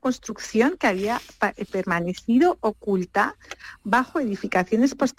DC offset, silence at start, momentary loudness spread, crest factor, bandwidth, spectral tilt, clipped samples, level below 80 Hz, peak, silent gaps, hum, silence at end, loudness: under 0.1%; 0.05 s; 8 LU; 16 dB; 15.5 kHz; -5.5 dB/octave; under 0.1%; -56 dBFS; -8 dBFS; none; none; 0.1 s; -23 LUFS